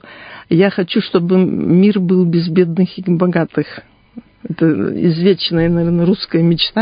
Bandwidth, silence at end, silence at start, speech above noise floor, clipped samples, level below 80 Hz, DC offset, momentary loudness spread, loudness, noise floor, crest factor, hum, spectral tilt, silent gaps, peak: 5.2 kHz; 0 s; 0.05 s; 25 dB; under 0.1%; -46 dBFS; under 0.1%; 7 LU; -14 LUFS; -39 dBFS; 14 dB; none; -12.5 dB/octave; none; 0 dBFS